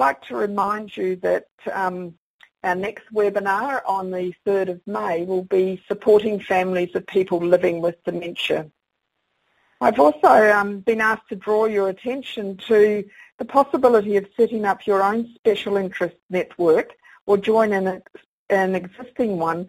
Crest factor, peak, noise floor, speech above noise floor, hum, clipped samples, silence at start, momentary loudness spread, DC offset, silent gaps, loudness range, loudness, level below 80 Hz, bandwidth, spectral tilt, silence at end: 20 dB; 0 dBFS; -76 dBFS; 56 dB; none; under 0.1%; 0 s; 11 LU; under 0.1%; 1.51-1.58 s, 2.18-2.39 s, 13.32-13.39 s, 15.39-15.43 s, 16.23-16.29 s, 17.21-17.27 s, 18.26-18.47 s; 5 LU; -21 LUFS; -62 dBFS; 15.5 kHz; -6 dB/octave; 0 s